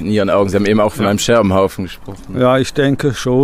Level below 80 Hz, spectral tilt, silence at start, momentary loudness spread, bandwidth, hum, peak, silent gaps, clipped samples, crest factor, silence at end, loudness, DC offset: -40 dBFS; -5.5 dB/octave; 0 s; 13 LU; 16 kHz; none; -2 dBFS; none; under 0.1%; 12 dB; 0 s; -14 LUFS; under 0.1%